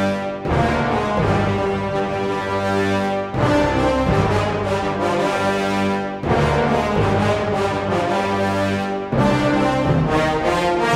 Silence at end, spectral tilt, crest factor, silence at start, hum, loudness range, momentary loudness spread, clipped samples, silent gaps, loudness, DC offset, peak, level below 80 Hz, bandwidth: 0 s; -6.5 dB/octave; 14 dB; 0 s; none; 1 LU; 4 LU; under 0.1%; none; -19 LUFS; under 0.1%; -4 dBFS; -36 dBFS; 15 kHz